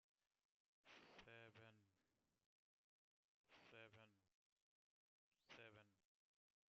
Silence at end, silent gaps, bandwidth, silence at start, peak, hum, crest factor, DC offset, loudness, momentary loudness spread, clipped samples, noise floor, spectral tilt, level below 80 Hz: 0.65 s; 2.46-3.44 s, 4.34-5.31 s; 6.8 kHz; 0.85 s; -50 dBFS; none; 22 dB; under 0.1%; -66 LUFS; 3 LU; under 0.1%; under -90 dBFS; -2.5 dB/octave; under -90 dBFS